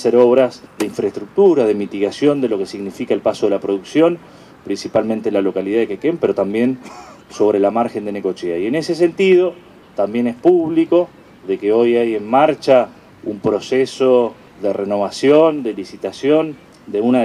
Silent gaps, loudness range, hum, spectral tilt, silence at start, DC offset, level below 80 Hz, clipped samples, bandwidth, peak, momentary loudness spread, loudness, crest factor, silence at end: none; 3 LU; none; -6 dB/octave; 0 s; under 0.1%; -60 dBFS; under 0.1%; 12.5 kHz; 0 dBFS; 13 LU; -17 LUFS; 16 dB; 0 s